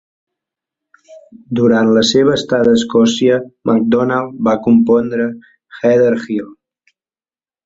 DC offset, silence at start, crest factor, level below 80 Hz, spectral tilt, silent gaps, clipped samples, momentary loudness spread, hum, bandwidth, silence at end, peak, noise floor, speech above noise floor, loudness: under 0.1%; 1.1 s; 14 dB; -52 dBFS; -5.5 dB/octave; none; under 0.1%; 9 LU; none; 7.8 kHz; 1.1 s; 0 dBFS; under -90 dBFS; over 77 dB; -13 LUFS